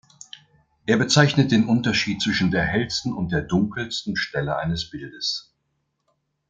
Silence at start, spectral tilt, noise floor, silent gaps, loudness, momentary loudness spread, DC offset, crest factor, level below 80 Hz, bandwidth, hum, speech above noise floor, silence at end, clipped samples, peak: 0.85 s; -5 dB/octave; -74 dBFS; none; -22 LUFS; 14 LU; under 0.1%; 20 dB; -50 dBFS; 9.2 kHz; none; 52 dB; 1.1 s; under 0.1%; -2 dBFS